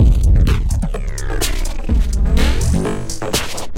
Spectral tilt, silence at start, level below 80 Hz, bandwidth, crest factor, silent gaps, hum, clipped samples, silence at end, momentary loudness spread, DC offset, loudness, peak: -5 dB/octave; 0 s; -16 dBFS; 16.5 kHz; 12 dB; none; none; under 0.1%; 0 s; 9 LU; under 0.1%; -18 LUFS; -2 dBFS